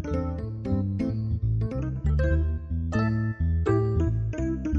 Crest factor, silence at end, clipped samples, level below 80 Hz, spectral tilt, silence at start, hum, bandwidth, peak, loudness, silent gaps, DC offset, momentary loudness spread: 14 dB; 0 s; under 0.1%; -32 dBFS; -9.5 dB/octave; 0 s; none; 8 kHz; -12 dBFS; -27 LUFS; none; under 0.1%; 5 LU